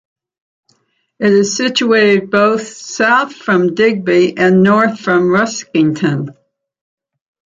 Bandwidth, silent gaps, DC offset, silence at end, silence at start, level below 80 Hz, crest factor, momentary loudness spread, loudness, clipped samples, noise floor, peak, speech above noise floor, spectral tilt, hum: 9 kHz; none; under 0.1%; 1.25 s; 1.2 s; -58 dBFS; 12 dB; 7 LU; -12 LUFS; under 0.1%; -61 dBFS; -2 dBFS; 49 dB; -5 dB/octave; none